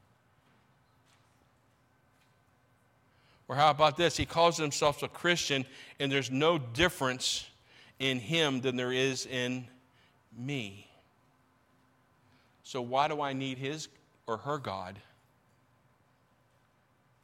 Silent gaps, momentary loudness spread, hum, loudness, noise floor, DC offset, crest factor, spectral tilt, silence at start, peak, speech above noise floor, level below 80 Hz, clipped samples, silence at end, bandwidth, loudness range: none; 14 LU; none; -31 LUFS; -69 dBFS; under 0.1%; 22 dB; -4 dB/octave; 3.5 s; -12 dBFS; 38 dB; -62 dBFS; under 0.1%; 2.25 s; 16.5 kHz; 12 LU